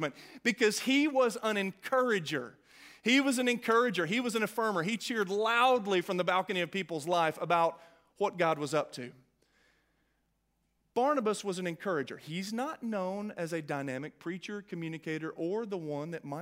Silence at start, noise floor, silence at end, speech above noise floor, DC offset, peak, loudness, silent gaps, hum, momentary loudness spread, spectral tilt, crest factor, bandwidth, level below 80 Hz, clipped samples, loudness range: 0 s; -77 dBFS; 0 s; 46 dB; under 0.1%; -14 dBFS; -32 LUFS; none; none; 12 LU; -4.5 dB/octave; 20 dB; 16 kHz; -80 dBFS; under 0.1%; 8 LU